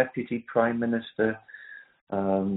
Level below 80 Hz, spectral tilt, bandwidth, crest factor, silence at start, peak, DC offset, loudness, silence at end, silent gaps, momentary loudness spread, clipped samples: -66 dBFS; -6 dB/octave; 4 kHz; 20 dB; 0 s; -8 dBFS; under 0.1%; -28 LUFS; 0 s; 2.01-2.07 s; 19 LU; under 0.1%